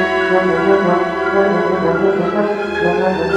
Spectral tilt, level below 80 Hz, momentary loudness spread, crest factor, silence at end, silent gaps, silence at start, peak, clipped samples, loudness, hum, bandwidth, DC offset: -7 dB/octave; -48 dBFS; 3 LU; 14 dB; 0 s; none; 0 s; 0 dBFS; under 0.1%; -15 LUFS; none; 8.8 kHz; under 0.1%